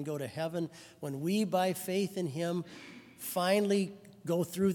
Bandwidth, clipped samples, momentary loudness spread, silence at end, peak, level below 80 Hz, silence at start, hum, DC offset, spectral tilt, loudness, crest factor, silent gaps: 18 kHz; under 0.1%; 14 LU; 0 s; -16 dBFS; -78 dBFS; 0 s; none; under 0.1%; -5.5 dB/octave; -33 LUFS; 18 dB; none